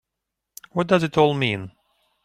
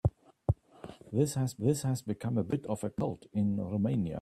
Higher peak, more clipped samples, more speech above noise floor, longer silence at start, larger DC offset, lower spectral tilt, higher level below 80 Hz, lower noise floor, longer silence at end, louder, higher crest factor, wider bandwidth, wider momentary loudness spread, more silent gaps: first, -4 dBFS vs -14 dBFS; neither; first, 62 dB vs 19 dB; first, 0.75 s vs 0.05 s; neither; second, -6 dB/octave vs -7.5 dB/octave; second, -58 dBFS vs -52 dBFS; first, -83 dBFS vs -51 dBFS; first, 0.55 s vs 0 s; first, -21 LUFS vs -33 LUFS; about the same, 20 dB vs 18 dB; first, 15.5 kHz vs 14 kHz; first, 12 LU vs 6 LU; neither